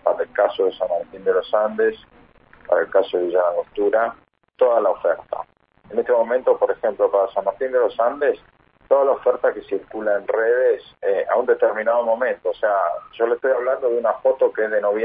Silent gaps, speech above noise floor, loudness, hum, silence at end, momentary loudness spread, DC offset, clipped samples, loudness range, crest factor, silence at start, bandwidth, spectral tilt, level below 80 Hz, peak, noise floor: none; 31 dB; -20 LUFS; none; 0 s; 6 LU; under 0.1%; under 0.1%; 1 LU; 16 dB; 0.05 s; 4.8 kHz; -8.5 dB/octave; -62 dBFS; -4 dBFS; -50 dBFS